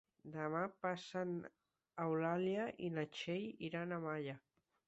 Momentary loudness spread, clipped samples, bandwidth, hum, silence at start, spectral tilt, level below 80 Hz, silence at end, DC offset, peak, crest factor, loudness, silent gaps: 11 LU; under 0.1%; 8 kHz; none; 0.25 s; -5 dB/octave; -82 dBFS; 0.5 s; under 0.1%; -26 dBFS; 18 dB; -43 LUFS; none